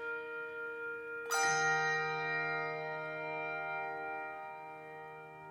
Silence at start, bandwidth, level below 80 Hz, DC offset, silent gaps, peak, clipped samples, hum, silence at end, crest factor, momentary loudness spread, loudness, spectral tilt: 0 s; 16 kHz; -80 dBFS; under 0.1%; none; -20 dBFS; under 0.1%; none; 0 s; 18 dB; 17 LU; -36 LUFS; -2 dB/octave